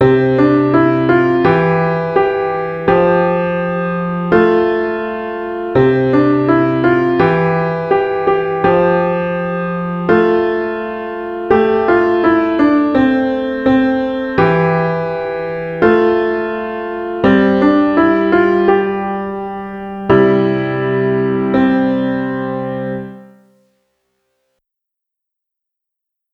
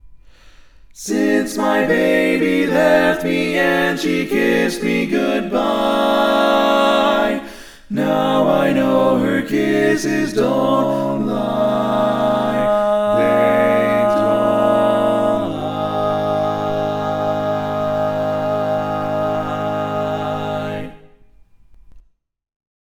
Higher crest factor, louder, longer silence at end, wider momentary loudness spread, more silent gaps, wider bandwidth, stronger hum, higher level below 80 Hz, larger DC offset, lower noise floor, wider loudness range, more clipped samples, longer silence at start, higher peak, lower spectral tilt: about the same, 14 dB vs 16 dB; first, -14 LUFS vs -17 LUFS; first, 3.1 s vs 1 s; first, 10 LU vs 7 LU; neither; second, 5.8 kHz vs 19 kHz; neither; about the same, -44 dBFS vs -46 dBFS; neither; first, -80 dBFS vs -47 dBFS; about the same, 4 LU vs 5 LU; neither; about the same, 0 s vs 0.05 s; about the same, 0 dBFS vs -2 dBFS; first, -9 dB/octave vs -5.5 dB/octave